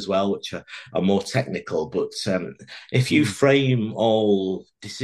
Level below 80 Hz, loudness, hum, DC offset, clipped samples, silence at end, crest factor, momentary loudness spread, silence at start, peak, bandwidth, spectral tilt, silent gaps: -60 dBFS; -22 LUFS; none; under 0.1%; under 0.1%; 0 s; 18 dB; 14 LU; 0 s; -4 dBFS; 12.5 kHz; -6 dB/octave; none